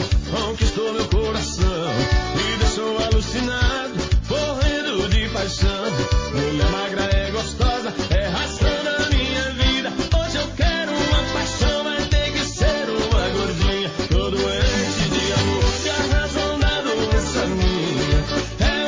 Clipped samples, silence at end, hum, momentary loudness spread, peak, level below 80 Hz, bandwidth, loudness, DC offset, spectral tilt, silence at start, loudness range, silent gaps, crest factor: under 0.1%; 0 s; none; 3 LU; -6 dBFS; -24 dBFS; 7.6 kHz; -21 LUFS; under 0.1%; -4.5 dB/octave; 0 s; 1 LU; none; 14 dB